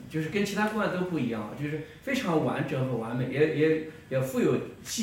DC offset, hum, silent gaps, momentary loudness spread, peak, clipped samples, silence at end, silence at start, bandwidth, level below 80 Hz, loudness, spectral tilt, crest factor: under 0.1%; none; none; 8 LU; -12 dBFS; under 0.1%; 0 s; 0 s; 16.5 kHz; -60 dBFS; -29 LUFS; -6 dB/octave; 18 dB